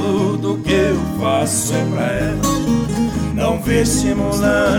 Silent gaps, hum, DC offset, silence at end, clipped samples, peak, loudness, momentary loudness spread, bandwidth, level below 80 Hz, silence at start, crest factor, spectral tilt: none; none; under 0.1%; 0 s; under 0.1%; -4 dBFS; -17 LUFS; 3 LU; over 20 kHz; -32 dBFS; 0 s; 12 dB; -5 dB/octave